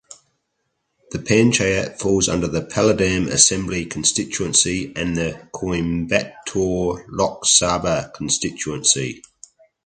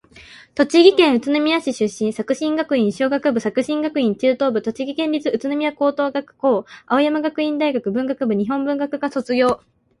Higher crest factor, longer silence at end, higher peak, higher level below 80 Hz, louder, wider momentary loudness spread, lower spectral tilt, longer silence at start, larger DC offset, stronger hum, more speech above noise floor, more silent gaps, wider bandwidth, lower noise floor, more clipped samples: about the same, 20 dB vs 18 dB; first, 0.65 s vs 0.45 s; about the same, 0 dBFS vs 0 dBFS; first, -42 dBFS vs -60 dBFS; about the same, -19 LUFS vs -19 LUFS; first, 11 LU vs 7 LU; second, -3 dB/octave vs -5 dB/octave; first, 1.1 s vs 0.15 s; neither; neither; first, 54 dB vs 26 dB; neither; second, 9.6 kHz vs 11.5 kHz; first, -73 dBFS vs -44 dBFS; neither